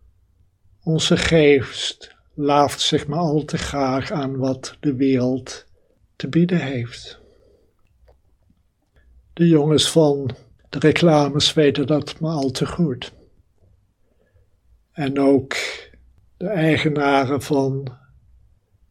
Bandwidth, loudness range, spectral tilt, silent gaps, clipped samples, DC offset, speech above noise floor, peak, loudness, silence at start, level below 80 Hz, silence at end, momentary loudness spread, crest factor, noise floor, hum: 14 kHz; 9 LU; -5.5 dB/octave; none; under 0.1%; under 0.1%; 43 dB; 0 dBFS; -19 LUFS; 0.85 s; -48 dBFS; 0.95 s; 17 LU; 20 dB; -62 dBFS; none